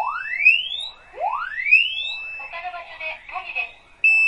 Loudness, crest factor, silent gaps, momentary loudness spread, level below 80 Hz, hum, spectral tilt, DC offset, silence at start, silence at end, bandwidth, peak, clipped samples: -19 LUFS; 20 dB; none; 17 LU; -58 dBFS; none; 0.5 dB/octave; under 0.1%; 0 s; 0 s; 11 kHz; -4 dBFS; under 0.1%